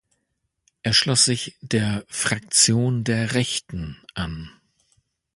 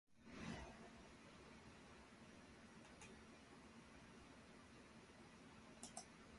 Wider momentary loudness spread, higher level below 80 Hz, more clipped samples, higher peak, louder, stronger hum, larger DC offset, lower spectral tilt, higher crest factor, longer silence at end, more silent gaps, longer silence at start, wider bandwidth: first, 16 LU vs 8 LU; first, -48 dBFS vs -72 dBFS; neither; first, -2 dBFS vs -36 dBFS; first, -21 LUFS vs -61 LUFS; neither; neither; about the same, -3 dB/octave vs -4 dB/octave; about the same, 22 dB vs 26 dB; first, 0.85 s vs 0 s; neither; first, 0.85 s vs 0.1 s; about the same, 11.5 kHz vs 11.5 kHz